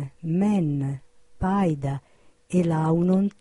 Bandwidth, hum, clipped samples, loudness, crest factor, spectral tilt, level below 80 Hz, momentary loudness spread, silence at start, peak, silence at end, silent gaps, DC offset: 11 kHz; none; under 0.1%; -24 LUFS; 12 dB; -9 dB/octave; -48 dBFS; 10 LU; 0 s; -12 dBFS; 0.1 s; none; under 0.1%